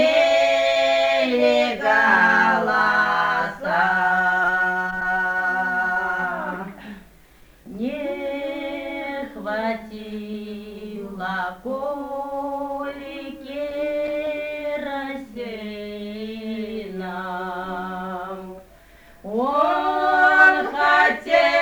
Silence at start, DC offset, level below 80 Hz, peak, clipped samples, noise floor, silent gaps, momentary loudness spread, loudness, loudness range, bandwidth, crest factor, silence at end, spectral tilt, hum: 0 s; under 0.1%; -54 dBFS; -2 dBFS; under 0.1%; -50 dBFS; none; 17 LU; -21 LUFS; 12 LU; over 20 kHz; 20 dB; 0 s; -4.5 dB/octave; none